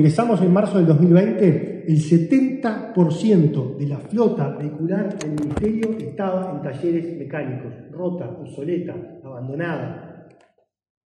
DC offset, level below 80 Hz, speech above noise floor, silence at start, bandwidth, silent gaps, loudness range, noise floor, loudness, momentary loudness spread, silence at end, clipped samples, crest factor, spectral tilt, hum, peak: under 0.1%; -52 dBFS; 41 dB; 0 s; 10 kHz; none; 11 LU; -61 dBFS; -20 LUFS; 15 LU; 0.85 s; under 0.1%; 18 dB; -8.5 dB/octave; none; -2 dBFS